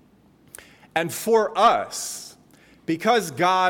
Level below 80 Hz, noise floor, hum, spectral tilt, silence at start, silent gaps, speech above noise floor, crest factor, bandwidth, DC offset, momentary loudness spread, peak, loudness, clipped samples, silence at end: -64 dBFS; -56 dBFS; none; -3.5 dB/octave; 0.95 s; none; 35 dB; 16 dB; 19 kHz; under 0.1%; 15 LU; -6 dBFS; -22 LUFS; under 0.1%; 0 s